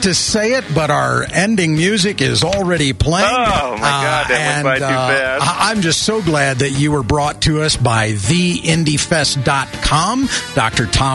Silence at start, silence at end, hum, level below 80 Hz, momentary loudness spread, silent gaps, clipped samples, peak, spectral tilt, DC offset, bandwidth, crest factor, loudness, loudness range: 0 s; 0 s; none; -32 dBFS; 2 LU; none; under 0.1%; -2 dBFS; -4 dB/octave; under 0.1%; 12 kHz; 12 dB; -14 LUFS; 1 LU